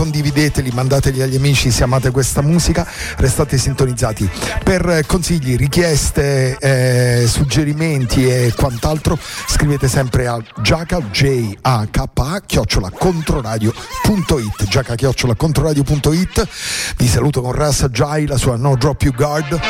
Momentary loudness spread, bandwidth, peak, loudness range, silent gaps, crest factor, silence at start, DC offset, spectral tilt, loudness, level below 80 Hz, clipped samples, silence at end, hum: 5 LU; 16.5 kHz; -4 dBFS; 2 LU; none; 10 dB; 0 s; under 0.1%; -5 dB/octave; -15 LUFS; -26 dBFS; under 0.1%; 0 s; none